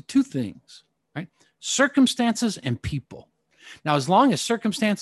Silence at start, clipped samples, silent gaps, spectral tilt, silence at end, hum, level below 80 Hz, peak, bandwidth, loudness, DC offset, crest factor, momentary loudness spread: 0.1 s; under 0.1%; none; -4.5 dB/octave; 0 s; none; -52 dBFS; -6 dBFS; 12.5 kHz; -23 LUFS; under 0.1%; 18 dB; 18 LU